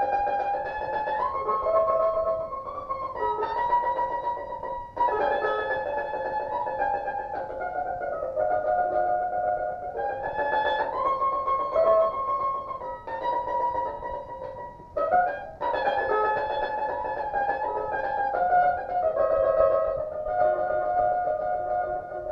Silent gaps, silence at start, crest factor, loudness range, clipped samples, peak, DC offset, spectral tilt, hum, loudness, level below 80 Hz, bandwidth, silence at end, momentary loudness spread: none; 0 s; 18 dB; 4 LU; under 0.1%; -10 dBFS; under 0.1%; -6.5 dB/octave; none; -27 LUFS; -52 dBFS; 6 kHz; 0 s; 9 LU